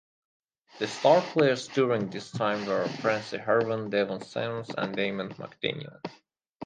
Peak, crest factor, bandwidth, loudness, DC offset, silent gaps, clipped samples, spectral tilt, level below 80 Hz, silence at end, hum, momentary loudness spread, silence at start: -8 dBFS; 22 dB; 9.6 kHz; -28 LUFS; under 0.1%; 6.49-6.60 s; under 0.1%; -5.5 dB/octave; -72 dBFS; 0 s; none; 13 LU; 0.75 s